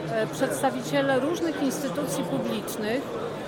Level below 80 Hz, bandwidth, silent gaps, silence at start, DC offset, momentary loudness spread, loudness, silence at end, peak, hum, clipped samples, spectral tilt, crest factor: -60 dBFS; 19 kHz; none; 0 s; under 0.1%; 5 LU; -27 LUFS; 0 s; -12 dBFS; none; under 0.1%; -4.5 dB/octave; 16 dB